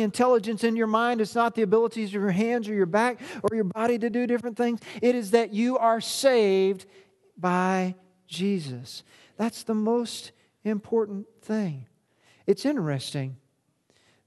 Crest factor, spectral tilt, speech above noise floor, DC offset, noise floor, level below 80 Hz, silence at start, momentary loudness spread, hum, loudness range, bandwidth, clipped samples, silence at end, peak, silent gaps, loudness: 20 dB; -5.5 dB/octave; 44 dB; under 0.1%; -69 dBFS; -70 dBFS; 0 s; 12 LU; none; 6 LU; 12.5 kHz; under 0.1%; 0.9 s; -6 dBFS; none; -26 LUFS